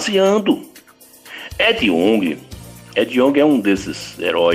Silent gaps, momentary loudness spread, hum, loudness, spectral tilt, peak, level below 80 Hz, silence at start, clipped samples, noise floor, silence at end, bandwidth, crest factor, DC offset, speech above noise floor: none; 17 LU; none; -16 LUFS; -4.5 dB/octave; -4 dBFS; -48 dBFS; 0 s; under 0.1%; -45 dBFS; 0 s; 16 kHz; 14 dB; under 0.1%; 29 dB